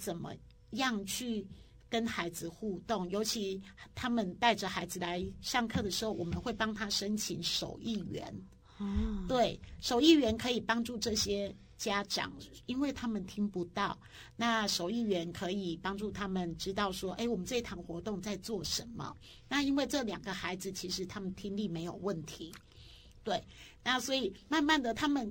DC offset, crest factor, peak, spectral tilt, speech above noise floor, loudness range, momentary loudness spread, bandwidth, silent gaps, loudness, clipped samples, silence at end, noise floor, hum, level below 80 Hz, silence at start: under 0.1%; 24 dB; -12 dBFS; -4 dB/octave; 21 dB; 6 LU; 12 LU; 17 kHz; none; -35 LUFS; under 0.1%; 0 s; -56 dBFS; none; -54 dBFS; 0 s